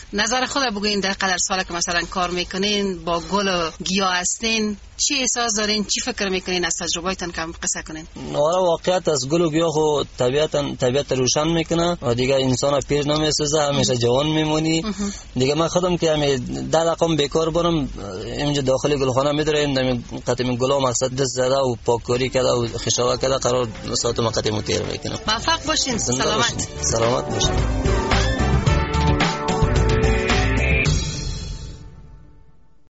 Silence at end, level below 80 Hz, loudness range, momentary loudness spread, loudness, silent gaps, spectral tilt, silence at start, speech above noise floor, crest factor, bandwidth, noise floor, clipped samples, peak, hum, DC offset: 0.75 s; -32 dBFS; 2 LU; 5 LU; -20 LUFS; none; -4 dB/octave; 0 s; 32 dB; 16 dB; 8.2 kHz; -53 dBFS; under 0.1%; -4 dBFS; none; under 0.1%